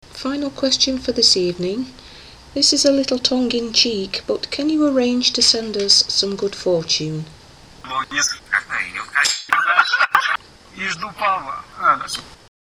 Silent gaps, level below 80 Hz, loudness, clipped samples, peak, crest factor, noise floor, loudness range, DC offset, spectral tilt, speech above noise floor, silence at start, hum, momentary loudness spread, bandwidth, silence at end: none; -50 dBFS; -17 LUFS; under 0.1%; 0 dBFS; 20 dB; -42 dBFS; 3 LU; under 0.1%; -2 dB/octave; 23 dB; 0.1 s; none; 12 LU; 19 kHz; 0.3 s